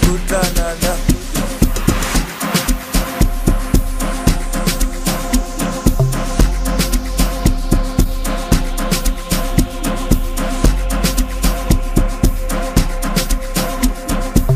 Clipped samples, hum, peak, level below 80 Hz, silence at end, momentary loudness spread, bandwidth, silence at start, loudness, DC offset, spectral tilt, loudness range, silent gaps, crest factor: under 0.1%; none; 0 dBFS; -18 dBFS; 0 s; 3 LU; 15.5 kHz; 0 s; -18 LUFS; under 0.1%; -4.5 dB/octave; 1 LU; none; 14 dB